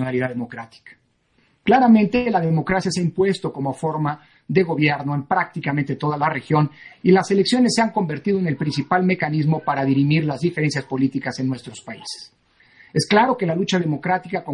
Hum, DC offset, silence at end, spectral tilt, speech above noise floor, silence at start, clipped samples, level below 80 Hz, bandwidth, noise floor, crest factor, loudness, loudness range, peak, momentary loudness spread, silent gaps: none; under 0.1%; 0 s; -6 dB/octave; 43 dB; 0 s; under 0.1%; -56 dBFS; 11 kHz; -62 dBFS; 18 dB; -20 LUFS; 3 LU; -2 dBFS; 10 LU; none